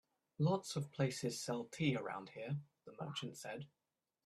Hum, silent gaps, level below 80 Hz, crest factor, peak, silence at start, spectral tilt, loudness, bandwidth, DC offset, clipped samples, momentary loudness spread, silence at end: none; none; -78 dBFS; 20 dB; -22 dBFS; 0.4 s; -5.5 dB/octave; -42 LUFS; 13.5 kHz; under 0.1%; under 0.1%; 12 LU; 0.6 s